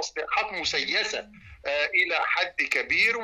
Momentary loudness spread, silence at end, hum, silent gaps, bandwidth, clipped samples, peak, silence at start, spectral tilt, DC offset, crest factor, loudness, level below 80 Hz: 8 LU; 0 s; none; none; 13 kHz; under 0.1%; -12 dBFS; 0 s; -1 dB/octave; under 0.1%; 16 dB; -25 LUFS; -58 dBFS